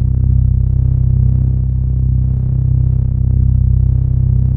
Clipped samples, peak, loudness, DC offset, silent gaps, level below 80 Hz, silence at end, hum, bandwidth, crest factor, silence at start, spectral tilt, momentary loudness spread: under 0.1%; -2 dBFS; -14 LUFS; under 0.1%; none; -16 dBFS; 0 s; none; 1.2 kHz; 10 dB; 0 s; -14 dB/octave; 2 LU